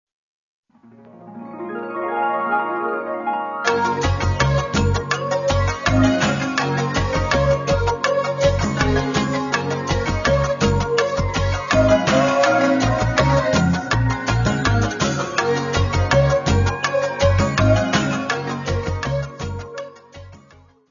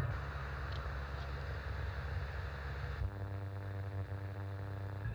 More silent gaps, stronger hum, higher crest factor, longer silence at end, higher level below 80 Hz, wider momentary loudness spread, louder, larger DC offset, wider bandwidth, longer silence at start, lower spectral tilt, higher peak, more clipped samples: neither; neither; about the same, 16 dB vs 16 dB; first, 0.55 s vs 0 s; first, -32 dBFS vs -46 dBFS; first, 8 LU vs 2 LU; first, -19 LUFS vs -43 LUFS; neither; about the same, 7.4 kHz vs 7.6 kHz; first, 1.15 s vs 0 s; second, -5.5 dB/octave vs -7 dB/octave; first, -2 dBFS vs -24 dBFS; neither